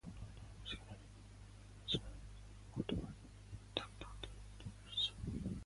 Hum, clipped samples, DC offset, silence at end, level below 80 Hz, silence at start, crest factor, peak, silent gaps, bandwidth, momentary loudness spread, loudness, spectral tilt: 50 Hz at -55 dBFS; under 0.1%; under 0.1%; 0 s; -56 dBFS; 0.05 s; 28 dB; -18 dBFS; none; 11.5 kHz; 18 LU; -46 LUFS; -5 dB/octave